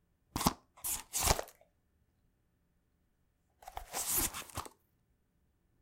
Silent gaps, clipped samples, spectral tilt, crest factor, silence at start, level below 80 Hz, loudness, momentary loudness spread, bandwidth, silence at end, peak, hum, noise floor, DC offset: none; under 0.1%; -2.5 dB/octave; 32 dB; 0.35 s; -50 dBFS; -35 LUFS; 19 LU; 17 kHz; 1.15 s; -8 dBFS; none; -76 dBFS; under 0.1%